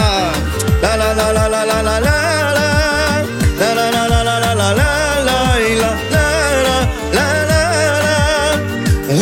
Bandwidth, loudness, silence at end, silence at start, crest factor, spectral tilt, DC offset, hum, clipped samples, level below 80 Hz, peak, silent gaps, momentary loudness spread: 17.5 kHz; -14 LUFS; 0 s; 0 s; 12 dB; -4.5 dB/octave; under 0.1%; none; under 0.1%; -24 dBFS; -2 dBFS; none; 3 LU